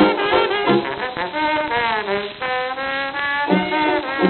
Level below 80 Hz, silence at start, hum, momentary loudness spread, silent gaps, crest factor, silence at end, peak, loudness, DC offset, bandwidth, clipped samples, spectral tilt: -52 dBFS; 0 s; none; 6 LU; none; 18 dB; 0 s; -2 dBFS; -20 LUFS; under 0.1%; 4.4 kHz; under 0.1%; -2.5 dB/octave